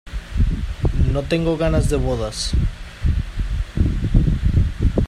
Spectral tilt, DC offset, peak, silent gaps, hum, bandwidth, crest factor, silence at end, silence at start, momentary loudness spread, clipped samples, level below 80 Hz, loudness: -6.5 dB/octave; under 0.1%; 0 dBFS; none; none; 12.5 kHz; 18 dB; 0 s; 0.05 s; 7 LU; under 0.1%; -22 dBFS; -21 LUFS